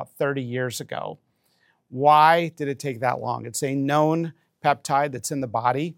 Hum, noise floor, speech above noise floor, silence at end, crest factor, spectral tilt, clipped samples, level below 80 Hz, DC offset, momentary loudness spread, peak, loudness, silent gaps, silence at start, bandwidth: none; -66 dBFS; 43 dB; 0.05 s; 20 dB; -5 dB/octave; under 0.1%; -74 dBFS; under 0.1%; 14 LU; -4 dBFS; -23 LUFS; none; 0 s; 17 kHz